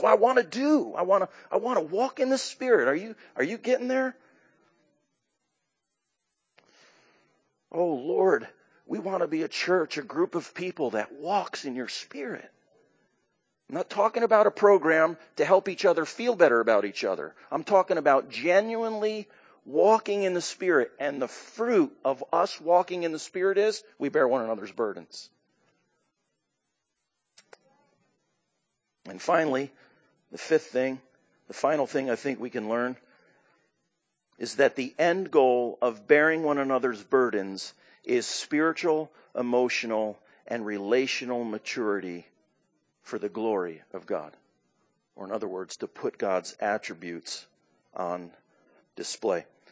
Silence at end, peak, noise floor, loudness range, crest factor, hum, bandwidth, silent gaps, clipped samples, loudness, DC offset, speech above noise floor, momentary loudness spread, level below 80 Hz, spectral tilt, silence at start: 0.3 s; -4 dBFS; -81 dBFS; 10 LU; 22 dB; none; 8 kHz; none; under 0.1%; -27 LUFS; under 0.1%; 55 dB; 15 LU; -84 dBFS; -4.5 dB/octave; 0 s